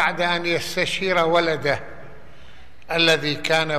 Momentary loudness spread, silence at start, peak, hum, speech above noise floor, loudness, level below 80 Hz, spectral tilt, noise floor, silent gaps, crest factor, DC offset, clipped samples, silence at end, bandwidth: 8 LU; 0 s; -4 dBFS; none; 27 dB; -20 LUFS; -52 dBFS; -3.5 dB/octave; -48 dBFS; none; 18 dB; 2%; under 0.1%; 0 s; 13.5 kHz